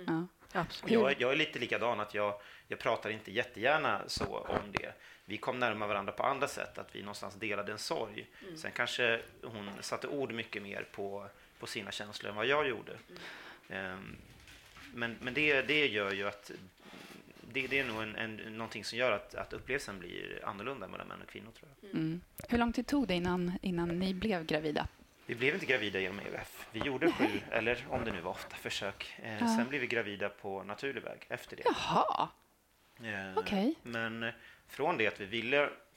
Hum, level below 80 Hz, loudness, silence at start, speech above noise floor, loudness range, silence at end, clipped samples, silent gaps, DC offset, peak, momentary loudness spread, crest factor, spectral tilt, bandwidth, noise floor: none; -62 dBFS; -35 LUFS; 0 s; 33 dB; 5 LU; 0.15 s; under 0.1%; none; under 0.1%; -12 dBFS; 16 LU; 24 dB; -4.5 dB/octave; 16.5 kHz; -69 dBFS